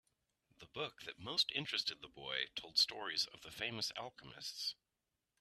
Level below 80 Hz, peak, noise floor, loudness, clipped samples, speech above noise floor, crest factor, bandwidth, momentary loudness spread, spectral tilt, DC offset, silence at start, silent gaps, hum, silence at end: -78 dBFS; -20 dBFS; -89 dBFS; -39 LUFS; under 0.1%; 47 dB; 22 dB; 14 kHz; 15 LU; -1.5 dB/octave; under 0.1%; 0.6 s; none; none; 0.65 s